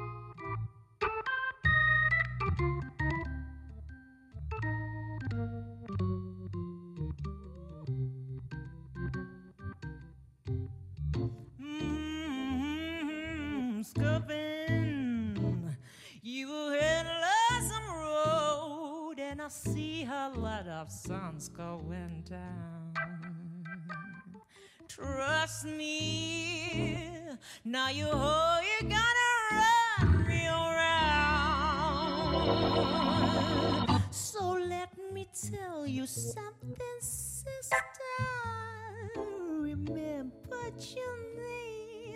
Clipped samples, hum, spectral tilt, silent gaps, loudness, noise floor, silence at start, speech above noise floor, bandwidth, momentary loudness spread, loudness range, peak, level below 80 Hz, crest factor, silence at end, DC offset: under 0.1%; none; -4.5 dB/octave; none; -33 LUFS; -58 dBFS; 0 s; 25 dB; 15.5 kHz; 17 LU; 13 LU; -14 dBFS; -50 dBFS; 18 dB; 0 s; under 0.1%